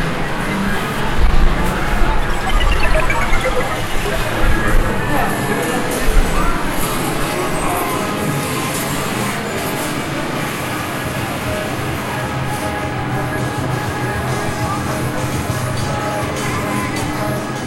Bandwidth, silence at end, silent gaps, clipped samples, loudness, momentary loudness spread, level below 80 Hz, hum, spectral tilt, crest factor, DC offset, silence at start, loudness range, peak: 16 kHz; 0 s; none; under 0.1%; -19 LUFS; 4 LU; -22 dBFS; none; -4.5 dB/octave; 16 dB; under 0.1%; 0 s; 3 LU; 0 dBFS